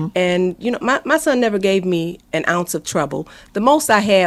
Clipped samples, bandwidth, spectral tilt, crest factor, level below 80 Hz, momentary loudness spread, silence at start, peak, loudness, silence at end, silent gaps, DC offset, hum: under 0.1%; 15.5 kHz; -4.5 dB/octave; 18 dB; -52 dBFS; 8 LU; 0 s; 0 dBFS; -18 LUFS; 0 s; none; under 0.1%; none